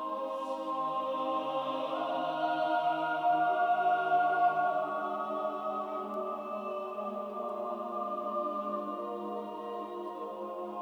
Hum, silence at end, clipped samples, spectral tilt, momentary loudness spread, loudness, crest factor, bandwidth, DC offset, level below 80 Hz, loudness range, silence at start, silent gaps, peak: none; 0 s; under 0.1%; -5.5 dB/octave; 11 LU; -33 LUFS; 16 dB; 8.4 kHz; under 0.1%; -80 dBFS; 7 LU; 0 s; none; -18 dBFS